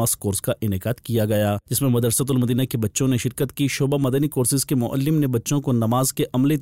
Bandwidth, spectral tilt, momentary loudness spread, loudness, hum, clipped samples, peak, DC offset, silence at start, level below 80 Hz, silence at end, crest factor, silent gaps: 16 kHz; -5.5 dB/octave; 4 LU; -21 LUFS; none; under 0.1%; -10 dBFS; 0.1%; 0 s; -52 dBFS; 0 s; 10 dB; none